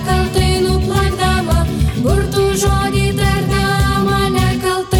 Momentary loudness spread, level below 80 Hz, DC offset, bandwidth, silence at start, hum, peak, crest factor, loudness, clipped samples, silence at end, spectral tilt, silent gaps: 2 LU; -22 dBFS; under 0.1%; 18 kHz; 0 s; none; -2 dBFS; 12 dB; -15 LUFS; under 0.1%; 0 s; -5.5 dB/octave; none